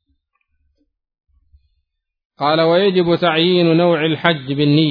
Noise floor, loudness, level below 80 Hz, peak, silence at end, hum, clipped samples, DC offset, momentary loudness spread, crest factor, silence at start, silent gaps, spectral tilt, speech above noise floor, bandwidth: -71 dBFS; -15 LUFS; -58 dBFS; 0 dBFS; 0 s; none; under 0.1%; under 0.1%; 4 LU; 16 dB; 2.4 s; none; -9 dB/octave; 57 dB; 5.2 kHz